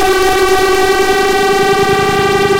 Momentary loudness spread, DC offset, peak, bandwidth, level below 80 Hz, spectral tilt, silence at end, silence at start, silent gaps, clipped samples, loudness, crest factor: 1 LU; under 0.1%; -2 dBFS; 17 kHz; -32 dBFS; -3.5 dB/octave; 0 s; 0 s; none; under 0.1%; -10 LUFS; 10 dB